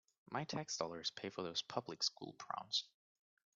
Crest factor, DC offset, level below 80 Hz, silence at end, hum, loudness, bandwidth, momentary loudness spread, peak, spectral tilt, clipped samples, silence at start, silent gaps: 22 dB; under 0.1%; -84 dBFS; 0.7 s; none; -43 LUFS; 8 kHz; 7 LU; -22 dBFS; -2 dB/octave; under 0.1%; 0.3 s; none